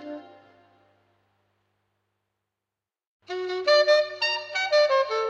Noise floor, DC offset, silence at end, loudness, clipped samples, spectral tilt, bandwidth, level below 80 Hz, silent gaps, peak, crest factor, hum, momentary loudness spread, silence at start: -89 dBFS; under 0.1%; 0 s; -22 LUFS; under 0.1%; -1 dB/octave; 8 kHz; -84 dBFS; 3.07-3.20 s; -10 dBFS; 18 dB; 50 Hz at -75 dBFS; 17 LU; 0 s